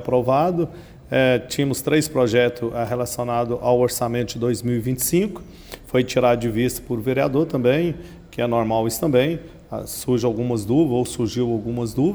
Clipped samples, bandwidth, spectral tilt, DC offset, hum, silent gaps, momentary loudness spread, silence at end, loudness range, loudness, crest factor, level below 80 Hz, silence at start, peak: under 0.1%; over 20 kHz; -5.5 dB/octave; under 0.1%; none; none; 8 LU; 0 s; 2 LU; -21 LUFS; 16 dB; -46 dBFS; 0 s; -4 dBFS